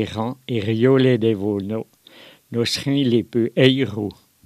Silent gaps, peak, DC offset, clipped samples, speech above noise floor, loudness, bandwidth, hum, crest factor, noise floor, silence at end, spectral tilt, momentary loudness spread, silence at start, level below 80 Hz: none; 0 dBFS; under 0.1%; under 0.1%; 28 dB; -20 LUFS; 14.5 kHz; none; 20 dB; -47 dBFS; 0.35 s; -6.5 dB/octave; 13 LU; 0 s; -58 dBFS